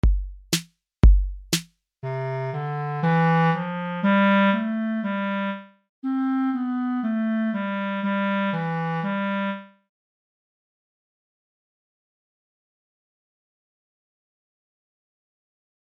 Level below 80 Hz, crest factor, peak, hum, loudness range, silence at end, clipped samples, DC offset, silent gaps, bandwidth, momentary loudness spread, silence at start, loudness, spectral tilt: -30 dBFS; 20 dB; -4 dBFS; none; 8 LU; 6.3 s; under 0.1%; under 0.1%; 5.89-6.02 s; 16 kHz; 10 LU; 0.05 s; -24 LUFS; -6 dB/octave